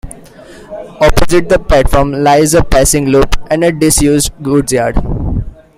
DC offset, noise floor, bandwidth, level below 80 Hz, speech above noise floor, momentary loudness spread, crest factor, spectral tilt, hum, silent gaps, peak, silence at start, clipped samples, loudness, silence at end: under 0.1%; -34 dBFS; 16 kHz; -20 dBFS; 25 dB; 9 LU; 10 dB; -4.5 dB/octave; none; none; 0 dBFS; 0.05 s; 0.1%; -11 LUFS; 0.25 s